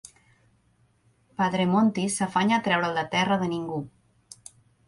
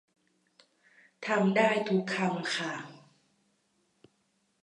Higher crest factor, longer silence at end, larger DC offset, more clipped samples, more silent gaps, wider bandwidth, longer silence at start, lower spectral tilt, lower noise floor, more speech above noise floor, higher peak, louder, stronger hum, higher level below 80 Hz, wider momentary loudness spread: about the same, 18 dB vs 20 dB; second, 1 s vs 1.7 s; neither; neither; neither; about the same, 11.5 kHz vs 10.5 kHz; first, 1.4 s vs 1.2 s; about the same, -5 dB/octave vs -5.5 dB/octave; second, -65 dBFS vs -74 dBFS; second, 41 dB vs 46 dB; first, -8 dBFS vs -12 dBFS; first, -25 LUFS vs -29 LUFS; neither; first, -62 dBFS vs -84 dBFS; first, 22 LU vs 16 LU